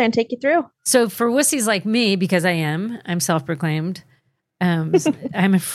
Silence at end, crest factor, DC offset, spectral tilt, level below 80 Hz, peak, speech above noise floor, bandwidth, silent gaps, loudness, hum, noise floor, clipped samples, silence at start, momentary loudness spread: 0 s; 16 dB; under 0.1%; -4.5 dB/octave; -68 dBFS; -4 dBFS; 43 dB; 15.5 kHz; none; -19 LUFS; none; -62 dBFS; under 0.1%; 0 s; 7 LU